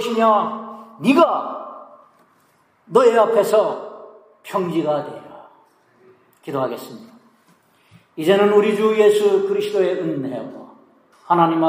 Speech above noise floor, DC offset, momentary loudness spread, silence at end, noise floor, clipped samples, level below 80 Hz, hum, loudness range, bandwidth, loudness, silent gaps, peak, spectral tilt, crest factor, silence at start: 42 dB; under 0.1%; 20 LU; 0 s; -59 dBFS; under 0.1%; -76 dBFS; none; 9 LU; 15.5 kHz; -18 LUFS; none; -2 dBFS; -6 dB/octave; 18 dB; 0 s